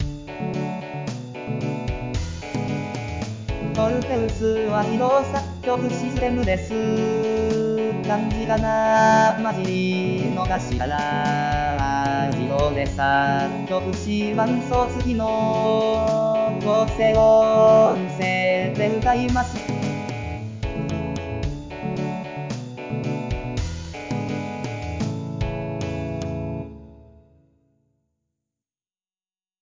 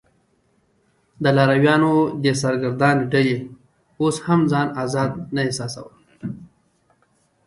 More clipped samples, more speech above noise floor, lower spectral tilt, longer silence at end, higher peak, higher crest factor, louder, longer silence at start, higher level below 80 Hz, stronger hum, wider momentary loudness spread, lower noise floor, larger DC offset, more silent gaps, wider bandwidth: neither; first, over 70 dB vs 45 dB; about the same, -6.5 dB/octave vs -6 dB/octave; first, 2.65 s vs 1 s; second, -6 dBFS vs -2 dBFS; about the same, 16 dB vs 18 dB; second, -22 LUFS vs -19 LUFS; second, 0 s vs 1.2 s; first, -36 dBFS vs -58 dBFS; neither; second, 12 LU vs 18 LU; first, under -90 dBFS vs -63 dBFS; neither; neither; second, 7.6 kHz vs 11.5 kHz